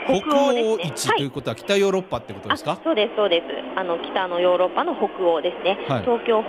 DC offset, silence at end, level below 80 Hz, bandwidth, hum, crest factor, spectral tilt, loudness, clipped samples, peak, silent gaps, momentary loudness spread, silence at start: under 0.1%; 0 s; -58 dBFS; 15.5 kHz; none; 14 dB; -4.5 dB/octave; -22 LUFS; under 0.1%; -6 dBFS; none; 7 LU; 0 s